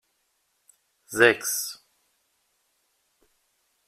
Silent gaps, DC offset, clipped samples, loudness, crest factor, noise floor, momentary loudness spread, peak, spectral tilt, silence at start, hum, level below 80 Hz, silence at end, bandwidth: none; under 0.1%; under 0.1%; -23 LUFS; 26 dB; -73 dBFS; 17 LU; -4 dBFS; -2 dB/octave; 1.1 s; none; -72 dBFS; 2.15 s; 16 kHz